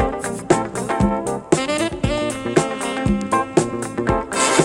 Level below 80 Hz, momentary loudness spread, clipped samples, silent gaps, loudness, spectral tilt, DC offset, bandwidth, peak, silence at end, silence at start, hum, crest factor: -36 dBFS; 5 LU; under 0.1%; none; -20 LUFS; -4.5 dB/octave; under 0.1%; 16.5 kHz; 0 dBFS; 0 s; 0 s; none; 18 dB